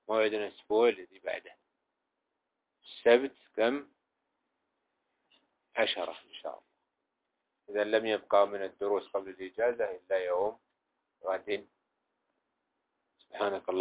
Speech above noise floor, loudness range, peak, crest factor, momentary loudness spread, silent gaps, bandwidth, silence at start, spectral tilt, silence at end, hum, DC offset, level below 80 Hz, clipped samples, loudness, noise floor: 54 dB; 8 LU; -10 dBFS; 22 dB; 15 LU; none; 4 kHz; 0.1 s; -1 dB/octave; 0 s; none; under 0.1%; -78 dBFS; under 0.1%; -32 LUFS; -85 dBFS